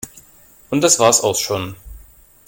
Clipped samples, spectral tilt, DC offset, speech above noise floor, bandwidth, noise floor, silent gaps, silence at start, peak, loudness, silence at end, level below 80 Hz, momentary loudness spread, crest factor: under 0.1%; -2.5 dB/octave; under 0.1%; 32 dB; 17 kHz; -48 dBFS; none; 0.05 s; 0 dBFS; -15 LUFS; 0.45 s; -46 dBFS; 17 LU; 20 dB